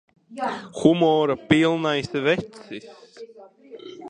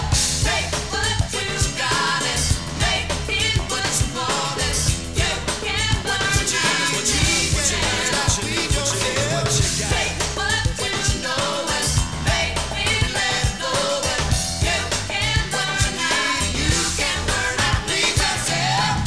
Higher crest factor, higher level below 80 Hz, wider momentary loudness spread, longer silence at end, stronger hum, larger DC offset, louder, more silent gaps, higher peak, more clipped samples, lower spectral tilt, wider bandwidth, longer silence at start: first, 22 dB vs 16 dB; second, -60 dBFS vs -30 dBFS; first, 23 LU vs 4 LU; about the same, 0 s vs 0 s; neither; second, under 0.1% vs 0.6%; about the same, -21 LUFS vs -20 LUFS; neither; about the same, -2 dBFS vs -4 dBFS; neither; first, -6 dB/octave vs -2.5 dB/octave; about the same, 10 kHz vs 11 kHz; first, 0.3 s vs 0 s